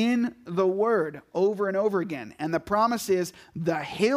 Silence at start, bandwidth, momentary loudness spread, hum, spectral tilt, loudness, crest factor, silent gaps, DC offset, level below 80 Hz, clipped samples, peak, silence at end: 0 s; 15.5 kHz; 7 LU; none; -5.5 dB/octave; -27 LUFS; 16 dB; none; under 0.1%; -62 dBFS; under 0.1%; -10 dBFS; 0 s